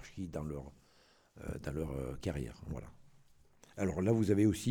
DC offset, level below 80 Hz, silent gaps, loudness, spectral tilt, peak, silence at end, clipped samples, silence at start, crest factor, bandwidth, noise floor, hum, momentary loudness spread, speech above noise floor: under 0.1%; -54 dBFS; none; -37 LUFS; -7 dB/octave; -18 dBFS; 0 s; under 0.1%; 0 s; 18 dB; 18.5 kHz; -67 dBFS; none; 18 LU; 32 dB